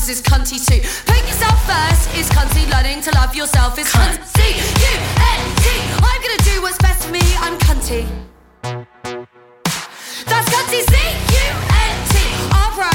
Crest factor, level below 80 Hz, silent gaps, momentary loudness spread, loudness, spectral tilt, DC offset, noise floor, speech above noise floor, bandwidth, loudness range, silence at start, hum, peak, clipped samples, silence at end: 14 dB; -18 dBFS; none; 12 LU; -15 LUFS; -3.5 dB/octave; under 0.1%; -35 dBFS; 21 dB; 19 kHz; 5 LU; 0 s; none; -2 dBFS; under 0.1%; 0 s